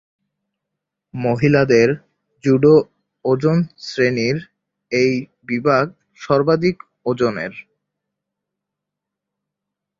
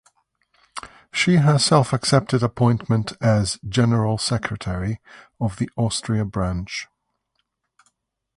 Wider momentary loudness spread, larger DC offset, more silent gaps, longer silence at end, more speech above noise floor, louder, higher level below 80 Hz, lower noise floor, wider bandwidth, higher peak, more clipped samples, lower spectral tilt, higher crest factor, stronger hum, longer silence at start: about the same, 13 LU vs 15 LU; neither; neither; first, 2.4 s vs 1.5 s; first, 66 dB vs 54 dB; first, -18 LUFS vs -21 LUFS; second, -56 dBFS vs -44 dBFS; first, -83 dBFS vs -74 dBFS; second, 7.6 kHz vs 11.5 kHz; about the same, -2 dBFS vs -4 dBFS; neither; first, -7 dB/octave vs -5.5 dB/octave; about the same, 18 dB vs 18 dB; neither; first, 1.15 s vs 0.75 s